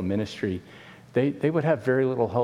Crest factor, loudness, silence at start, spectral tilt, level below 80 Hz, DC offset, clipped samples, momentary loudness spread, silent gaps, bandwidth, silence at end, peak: 16 dB; -26 LUFS; 0 s; -8 dB/octave; -62 dBFS; under 0.1%; under 0.1%; 7 LU; none; 11.5 kHz; 0 s; -8 dBFS